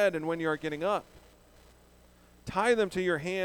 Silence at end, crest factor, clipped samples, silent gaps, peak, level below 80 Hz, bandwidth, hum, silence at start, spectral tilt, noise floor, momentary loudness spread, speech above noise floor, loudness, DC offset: 0 s; 18 dB; under 0.1%; none; -12 dBFS; -60 dBFS; over 20 kHz; 60 Hz at -60 dBFS; 0 s; -5 dB/octave; -59 dBFS; 8 LU; 29 dB; -30 LUFS; under 0.1%